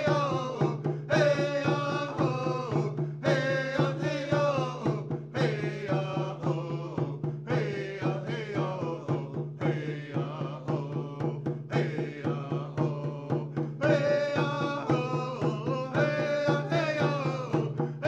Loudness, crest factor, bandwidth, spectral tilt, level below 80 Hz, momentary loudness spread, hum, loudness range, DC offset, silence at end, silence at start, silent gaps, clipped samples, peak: -30 LUFS; 18 dB; 8 kHz; -7 dB/octave; -70 dBFS; 7 LU; none; 4 LU; under 0.1%; 0 s; 0 s; none; under 0.1%; -12 dBFS